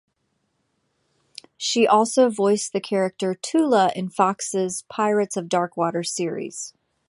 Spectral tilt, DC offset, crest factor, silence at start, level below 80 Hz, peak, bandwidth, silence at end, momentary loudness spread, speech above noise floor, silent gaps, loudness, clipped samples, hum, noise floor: -4 dB/octave; under 0.1%; 20 dB; 1.6 s; -72 dBFS; -4 dBFS; 11.5 kHz; 0.4 s; 10 LU; 51 dB; none; -22 LUFS; under 0.1%; none; -72 dBFS